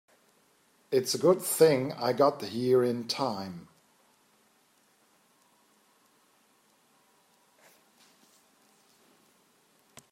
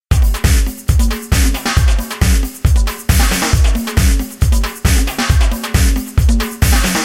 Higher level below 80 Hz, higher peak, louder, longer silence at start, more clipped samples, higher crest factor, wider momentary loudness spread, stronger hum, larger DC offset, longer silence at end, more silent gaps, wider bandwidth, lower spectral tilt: second, -80 dBFS vs -14 dBFS; second, -10 dBFS vs 0 dBFS; second, -27 LUFS vs -15 LUFS; first, 0.9 s vs 0.1 s; neither; first, 22 dB vs 12 dB; first, 10 LU vs 3 LU; neither; neither; first, 6.5 s vs 0 s; neither; about the same, 16 kHz vs 16.5 kHz; about the same, -4.5 dB/octave vs -4.5 dB/octave